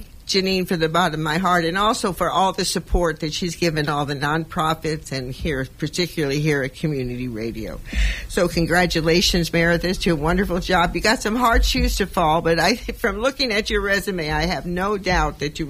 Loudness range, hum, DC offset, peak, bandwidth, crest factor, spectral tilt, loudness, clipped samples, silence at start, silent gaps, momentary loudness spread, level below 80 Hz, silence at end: 5 LU; none; under 0.1%; -4 dBFS; 16 kHz; 16 dB; -4.5 dB/octave; -21 LUFS; under 0.1%; 0 s; none; 8 LU; -30 dBFS; 0 s